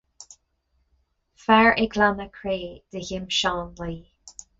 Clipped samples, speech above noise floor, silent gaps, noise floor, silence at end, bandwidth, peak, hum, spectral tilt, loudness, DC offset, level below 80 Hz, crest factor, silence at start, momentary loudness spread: under 0.1%; 47 dB; none; -70 dBFS; 0.3 s; 8 kHz; -4 dBFS; none; -4 dB/octave; -22 LUFS; under 0.1%; -48 dBFS; 20 dB; 0.2 s; 19 LU